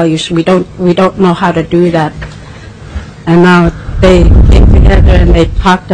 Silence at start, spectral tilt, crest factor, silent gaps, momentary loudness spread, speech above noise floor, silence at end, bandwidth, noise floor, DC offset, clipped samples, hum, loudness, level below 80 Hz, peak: 0 s; -7 dB/octave; 6 dB; none; 18 LU; 21 dB; 0 s; 9.6 kHz; -27 dBFS; under 0.1%; 0.5%; none; -8 LUFS; -10 dBFS; 0 dBFS